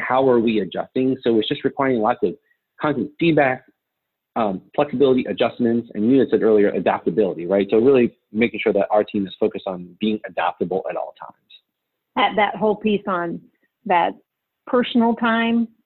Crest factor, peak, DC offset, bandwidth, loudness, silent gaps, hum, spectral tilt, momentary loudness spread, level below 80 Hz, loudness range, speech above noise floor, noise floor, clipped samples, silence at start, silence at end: 16 dB; -4 dBFS; under 0.1%; 4.3 kHz; -20 LUFS; none; none; -10 dB/octave; 9 LU; -60 dBFS; 5 LU; 60 dB; -80 dBFS; under 0.1%; 0 s; 0.2 s